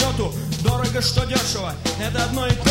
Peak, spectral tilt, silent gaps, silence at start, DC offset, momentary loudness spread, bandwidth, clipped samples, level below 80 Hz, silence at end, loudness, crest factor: -2 dBFS; -4.5 dB/octave; none; 0 s; under 0.1%; 5 LU; 16.5 kHz; under 0.1%; -32 dBFS; 0 s; -21 LUFS; 18 dB